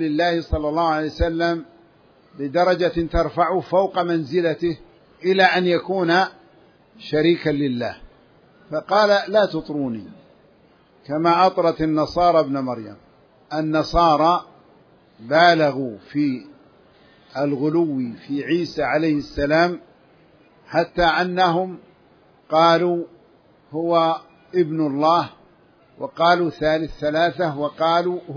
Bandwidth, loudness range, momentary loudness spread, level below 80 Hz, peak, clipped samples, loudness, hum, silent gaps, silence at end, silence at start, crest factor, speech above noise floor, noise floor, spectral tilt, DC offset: 5.4 kHz; 3 LU; 13 LU; -42 dBFS; -2 dBFS; under 0.1%; -20 LUFS; none; none; 0 s; 0 s; 20 dB; 35 dB; -54 dBFS; -6.5 dB/octave; under 0.1%